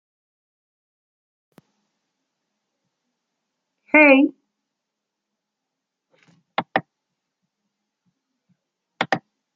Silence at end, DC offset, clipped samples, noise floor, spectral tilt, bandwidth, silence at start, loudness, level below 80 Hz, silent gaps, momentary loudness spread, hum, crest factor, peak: 0.35 s; under 0.1%; under 0.1%; -82 dBFS; -6 dB/octave; 7.4 kHz; 3.95 s; -18 LUFS; -78 dBFS; none; 17 LU; none; 24 dB; -2 dBFS